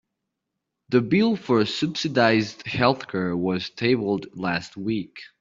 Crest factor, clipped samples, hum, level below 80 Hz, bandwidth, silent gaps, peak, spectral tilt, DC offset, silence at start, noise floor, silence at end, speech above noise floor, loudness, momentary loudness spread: 20 dB; under 0.1%; none; -60 dBFS; 7.6 kHz; none; -4 dBFS; -6 dB/octave; under 0.1%; 0.9 s; -82 dBFS; 0.15 s; 59 dB; -23 LUFS; 9 LU